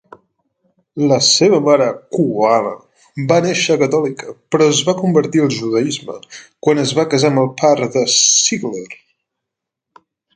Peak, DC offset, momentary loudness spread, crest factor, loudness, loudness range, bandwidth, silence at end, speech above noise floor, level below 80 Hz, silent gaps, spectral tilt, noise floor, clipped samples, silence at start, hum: 0 dBFS; under 0.1%; 15 LU; 16 dB; -14 LUFS; 2 LU; 10 kHz; 1.4 s; 66 dB; -62 dBFS; none; -3.5 dB/octave; -81 dBFS; under 0.1%; 0.95 s; none